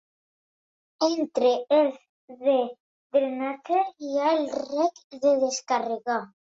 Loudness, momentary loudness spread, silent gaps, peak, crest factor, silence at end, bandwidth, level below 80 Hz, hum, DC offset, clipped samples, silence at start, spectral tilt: -25 LUFS; 6 LU; 2.09-2.28 s, 2.80-3.10 s, 5.04-5.10 s; -10 dBFS; 16 dB; 0.2 s; 8 kHz; -76 dBFS; none; under 0.1%; under 0.1%; 1 s; -3 dB/octave